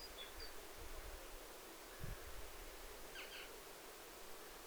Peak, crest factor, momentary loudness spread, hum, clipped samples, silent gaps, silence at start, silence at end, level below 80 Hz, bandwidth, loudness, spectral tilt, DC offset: -36 dBFS; 16 dB; 3 LU; none; under 0.1%; none; 0 s; 0 s; -58 dBFS; over 20 kHz; -53 LUFS; -2.5 dB/octave; under 0.1%